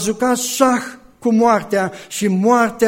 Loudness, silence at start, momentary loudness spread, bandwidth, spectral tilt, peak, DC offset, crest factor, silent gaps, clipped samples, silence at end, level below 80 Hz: -17 LUFS; 0 s; 9 LU; 16.5 kHz; -4.5 dB/octave; 0 dBFS; under 0.1%; 16 dB; none; under 0.1%; 0 s; -56 dBFS